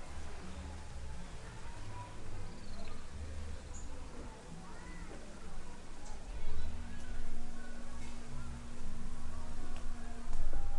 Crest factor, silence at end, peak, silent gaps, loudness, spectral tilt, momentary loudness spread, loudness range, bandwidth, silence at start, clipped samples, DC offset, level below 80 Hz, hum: 16 dB; 0 s; -18 dBFS; none; -48 LUFS; -5 dB/octave; 5 LU; 2 LU; 10 kHz; 0 s; under 0.1%; under 0.1%; -40 dBFS; none